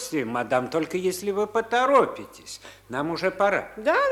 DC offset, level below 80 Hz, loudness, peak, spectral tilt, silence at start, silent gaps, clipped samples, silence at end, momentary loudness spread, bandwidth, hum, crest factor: under 0.1%; -60 dBFS; -24 LUFS; -8 dBFS; -4.5 dB/octave; 0 s; none; under 0.1%; 0 s; 19 LU; 17 kHz; none; 18 dB